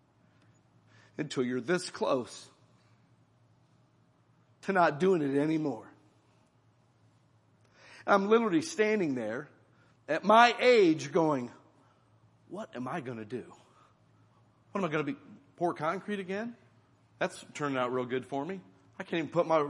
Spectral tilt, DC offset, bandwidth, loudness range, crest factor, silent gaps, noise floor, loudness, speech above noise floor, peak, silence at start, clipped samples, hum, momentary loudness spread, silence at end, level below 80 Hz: -5.5 dB/octave; under 0.1%; 11.5 kHz; 11 LU; 24 dB; none; -67 dBFS; -30 LUFS; 37 dB; -8 dBFS; 1.2 s; under 0.1%; none; 18 LU; 0 s; -82 dBFS